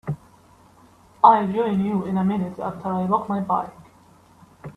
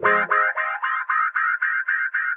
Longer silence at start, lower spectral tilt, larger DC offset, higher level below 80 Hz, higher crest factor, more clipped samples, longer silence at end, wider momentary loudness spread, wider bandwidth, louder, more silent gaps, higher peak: about the same, 0.05 s vs 0 s; first, -9 dB/octave vs -7 dB/octave; neither; first, -60 dBFS vs -72 dBFS; first, 22 dB vs 16 dB; neither; about the same, 0.05 s vs 0 s; first, 17 LU vs 5 LU; about the same, 4.7 kHz vs 4.7 kHz; about the same, -21 LUFS vs -21 LUFS; neither; first, 0 dBFS vs -6 dBFS